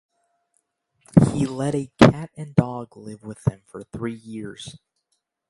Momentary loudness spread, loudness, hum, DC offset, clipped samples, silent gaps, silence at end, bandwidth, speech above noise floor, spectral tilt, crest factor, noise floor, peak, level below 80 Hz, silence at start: 22 LU; -21 LUFS; none; under 0.1%; under 0.1%; none; 0.8 s; 11.5 kHz; 52 dB; -7 dB/octave; 24 dB; -75 dBFS; 0 dBFS; -46 dBFS; 1.15 s